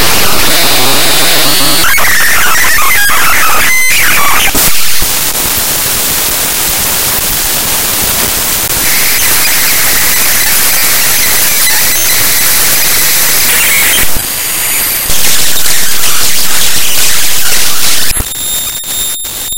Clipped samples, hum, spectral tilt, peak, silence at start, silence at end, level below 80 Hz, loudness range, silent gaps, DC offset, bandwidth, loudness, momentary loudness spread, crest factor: 3%; none; 0 dB/octave; 0 dBFS; 0 s; 0 s; -28 dBFS; 3 LU; none; 20%; over 20 kHz; -7 LUFS; 3 LU; 10 dB